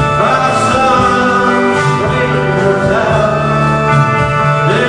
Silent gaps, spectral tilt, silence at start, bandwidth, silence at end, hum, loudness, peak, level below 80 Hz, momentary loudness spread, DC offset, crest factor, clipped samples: none; -6 dB/octave; 0 s; 10 kHz; 0 s; none; -11 LUFS; 0 dBFS; -34 dBFS; 2 LU; under 0.1%; 10 dB; under 0.1%